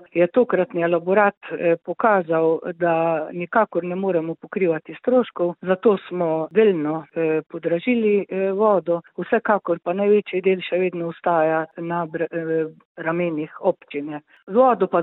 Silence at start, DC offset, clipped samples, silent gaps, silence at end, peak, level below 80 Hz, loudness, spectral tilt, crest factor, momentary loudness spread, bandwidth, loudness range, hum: 0.15 s; under 0.1%; under 0.1%; 1.37-1.41 s, 12.85-12.95 s; 0 s; -4 dBFS; -70 dBFS; -21 LUFS; -11 dB/octave; 18 dB; 8 LU; 4.1 kHz; 3 LU; none